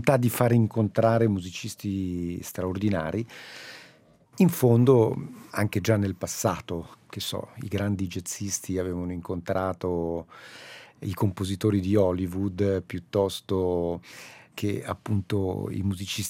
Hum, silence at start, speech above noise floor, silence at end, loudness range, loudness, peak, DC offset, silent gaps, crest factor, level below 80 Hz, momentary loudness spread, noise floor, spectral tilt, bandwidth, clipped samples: none; 0 s; 31 dB; 0 s; 6 LU; -27 LUFS; -4 dBFS; under 0.1%; none; 22 dB; -60 dBFS; 15 LU; -57 dBFS; -6 dB/octave; 17 kHz; under 0.1%